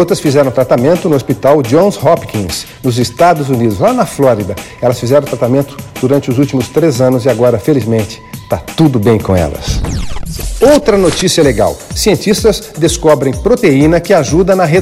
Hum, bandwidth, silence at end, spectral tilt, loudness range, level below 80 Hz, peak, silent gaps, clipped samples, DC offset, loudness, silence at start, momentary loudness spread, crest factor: none; 16.5 kHz; 0 s; -5.5 dB/octave; 2 LU; -28 dBFS; 0 dBFS; none; under 0.1%; under 0.1%; -11 LUFS; 0 s; 9 LU; 10 dB